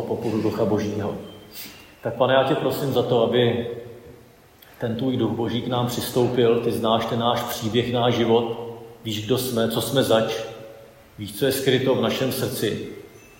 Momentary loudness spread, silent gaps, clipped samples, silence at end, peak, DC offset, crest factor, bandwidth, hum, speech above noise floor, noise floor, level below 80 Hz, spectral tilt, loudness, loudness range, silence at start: 17 LU; none; under 0.1%; 0.2 s; -4 dBFS; under 0.1%; 18 dB; 16.5 kHz; none; 28 dB; -50 dBFS; -56 dBFS; -5.5 dB/octave; -22 LUFS; 3 LU; 0 s